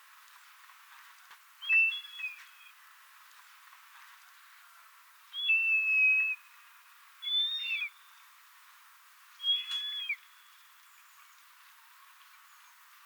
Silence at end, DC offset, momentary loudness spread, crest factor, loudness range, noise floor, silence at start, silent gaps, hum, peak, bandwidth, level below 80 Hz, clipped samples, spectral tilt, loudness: 2.9 s; under 0.1%; 17 LU; 18 dB; 12 LU; -58 dBFS; 0.9 s; none; none; -18 dBFS; over 20 kHz; under -90 dBFS; under 0.1%; 8 dB/octave; -28 LUFS